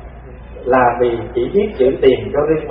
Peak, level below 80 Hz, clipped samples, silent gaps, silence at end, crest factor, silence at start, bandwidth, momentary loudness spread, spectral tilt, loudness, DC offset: 0 dBFS; -36 dBFS; under 0.1%; none; 0 s; 16 dB; 0 s; 4.1 kHz; 13 LU; -12 dB/octave; -15 LUFS; under 0.1%